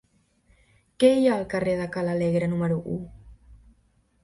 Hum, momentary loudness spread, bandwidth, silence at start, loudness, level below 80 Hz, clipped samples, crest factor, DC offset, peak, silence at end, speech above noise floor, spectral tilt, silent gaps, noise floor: none; 13 LU; 11.5 kHz; 1 s; -24 LUFS; -54 dBFS; under 0.1%; 20 dB; under 0.1%; -6 dBFS; 0.7 s; 41 dB; -7 dB/octave; none; -65 dBFS